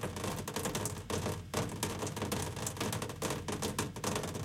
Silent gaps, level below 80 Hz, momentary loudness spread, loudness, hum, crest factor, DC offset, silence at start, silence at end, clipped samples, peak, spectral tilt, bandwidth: none; -56 dBFS; 2 LU; -37 LUFS; none; 20 dB; under 0.1%; 0 s; 0 s; under 0.1%; -18 dBFS; -4 dB/octave; 17 kHz